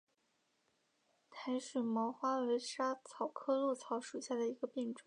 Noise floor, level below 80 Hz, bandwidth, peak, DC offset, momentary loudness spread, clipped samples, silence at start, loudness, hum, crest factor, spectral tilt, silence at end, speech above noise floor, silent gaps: -80 dBFS; under -90 dBFS; 11 kHz; -24 dBFS; under 0.1%; 6 LU; under 0.1%; 1.3 s; -39 LUFS; none; 16 dB; -4 dB/octave; 0.05 s; 42 dB; none